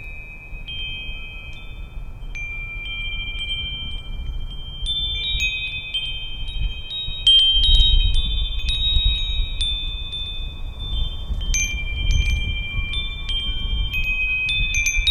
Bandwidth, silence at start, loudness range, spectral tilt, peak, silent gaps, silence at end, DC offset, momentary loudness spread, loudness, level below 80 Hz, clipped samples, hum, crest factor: 12.5 kHz; 0 s; 11 LU; -1.5 dB/octave; -2 dBFS; none; 0 s; under 0.1%; 17 LU; -21 LUFS; -24 dBFS; under 0.1%; none; 20 dB